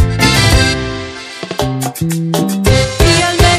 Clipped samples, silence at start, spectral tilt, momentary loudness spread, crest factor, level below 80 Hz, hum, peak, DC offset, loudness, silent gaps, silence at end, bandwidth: 0.2%; 0 s; -4.5 dB/octave; 13 LU; 12 dB; -20 dBFS; none; 0 dBFS; under 0.1%; -12 LUFS; none; 0 s; 16 kHz